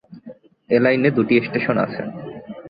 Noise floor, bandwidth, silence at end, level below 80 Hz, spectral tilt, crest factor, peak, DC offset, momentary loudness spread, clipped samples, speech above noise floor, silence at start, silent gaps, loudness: -43 dBFS; 5 kHz; 0 s; -58 dBFS; -11 dB/octave; 18 dB; -2 dBFS; under 0.1%; 16 LU; under 0.1%; 25 dB; 0.1 s; none; -19 LUFS